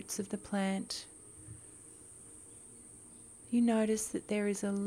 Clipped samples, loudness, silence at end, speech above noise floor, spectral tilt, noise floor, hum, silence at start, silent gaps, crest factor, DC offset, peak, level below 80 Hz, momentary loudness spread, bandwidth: under 0.1%; -34 LUFS; 0 s; 21 dB; -4.5 dB/octave; -54 dBFS; none; 0 s; none; 16 dB; under 0.1%; -20 dBFS; -68 dBFS; 21 LU; 16 kHz